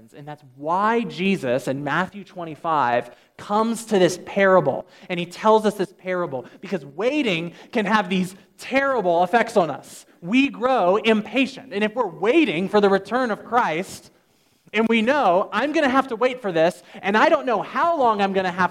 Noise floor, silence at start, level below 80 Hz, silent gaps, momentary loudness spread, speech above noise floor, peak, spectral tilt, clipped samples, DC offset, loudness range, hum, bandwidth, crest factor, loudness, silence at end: -61 dBFS; 0.15 s; -66 dBFS; none; 12 LU; 40 dB; -2 dBFS; -5.5 dB/octave; under 0.1%; under 0.1%; 3 LU; none; 15.5 kHz; 18 dB; -21 LUFS; 0 s